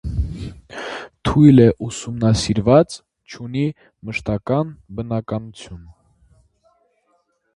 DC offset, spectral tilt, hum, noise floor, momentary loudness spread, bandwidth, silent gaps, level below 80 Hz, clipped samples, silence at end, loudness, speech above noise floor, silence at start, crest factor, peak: under 0.1%; -7 dB/octave; none; -65 dBFS; 22 LU; 11.5 kHz; none; -36 dBFS; under 0.1%; 1.75 s; -18 LUFS; 48 dB; 0.05 s; 20 dB; 0 dBFS